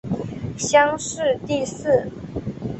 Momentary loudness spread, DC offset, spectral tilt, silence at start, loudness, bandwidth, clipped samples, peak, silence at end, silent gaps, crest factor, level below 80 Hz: 14 LU; under 0.1%; -4.5 dB/octave; 0.05 s; -22 LUFS; 8.6 kHz; under 0.1%; -2 dBFS; 0 s; none; 20 dB; -48 dBFS